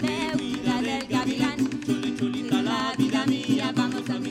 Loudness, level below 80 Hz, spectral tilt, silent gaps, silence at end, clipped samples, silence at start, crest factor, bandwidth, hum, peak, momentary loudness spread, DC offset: -26 LUFS; -56 dBFS; -5 dB/octave; none; 0 s; under 0.1%; 0 s; 14 dB; 14.5 kHz; none; -10 dBFS; 3 LU; under 0.1%